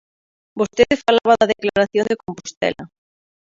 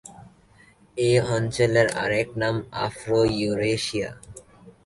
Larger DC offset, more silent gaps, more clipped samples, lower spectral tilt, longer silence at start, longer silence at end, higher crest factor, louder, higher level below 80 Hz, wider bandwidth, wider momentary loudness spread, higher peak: neither; first, 2.57-2.61 s vs none; neither; about the same, -4.5 dB/octave vs -5.5 dB/octave; first, 0.55 s vs 0.05 s; first, 0.55 s vs 0.15 s; about the same, 20 dB vs 18 dB; first, -18 LUFS vs -23 LUFS; about the same, -52 dBFS vs -52 dBFS; second, 7.6 kHz vs 11.5 kHz; first, 13 LU vs 10 LU; first, 0 dBFS vs -6 dBFS